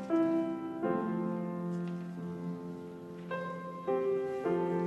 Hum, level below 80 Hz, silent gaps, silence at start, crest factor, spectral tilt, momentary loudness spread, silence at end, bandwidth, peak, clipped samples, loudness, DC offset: none; -74 dBFS; none; 0 s; 16 dB; -9 dB/octave; 10 LU; 0 s; 11 kHz; -20 dBFS; under 0.1%; -35 LUFS; under 0.1%